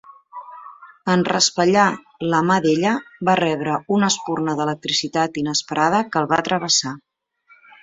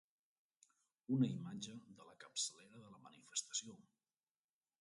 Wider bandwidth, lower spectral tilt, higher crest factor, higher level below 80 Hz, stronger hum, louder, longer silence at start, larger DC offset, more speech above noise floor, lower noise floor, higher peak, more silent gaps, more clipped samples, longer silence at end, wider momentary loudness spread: second, 8 kHz vs 11.5 kHz; about the same, -3.5 dB/octave vs -4 dB/octave; about the same, 18 dB vs 22 dB; first, -62 dBFS vs -88 dBFS; neither; first, -19 LUFS vs -43 LUFS; second, 0.05 s vs 1.1 s; neither; second, 36 dB vs over 48 dB; second, -56 dBFS vs under -90 dBFS; first, -2 dBFS vs -26 dBFS; neither; neither; second, 0.85 s vs 1.05 s; second, 16 LU vs 23 LU